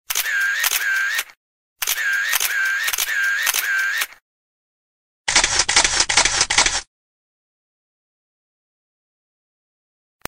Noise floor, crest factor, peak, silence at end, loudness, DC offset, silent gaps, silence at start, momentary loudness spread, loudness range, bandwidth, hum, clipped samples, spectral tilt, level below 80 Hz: under -90 dBFS; 22 dB; 0 dBFS; 3.45 s; -18 LUFS; under 0.1%; 1.37-1.76 s, 4.22-5.25 s; 0.1 s; 9 LU; 3 LU; 16.5 kHz; none; under 0.1%; 1.5 dB/octave; -44 dBFS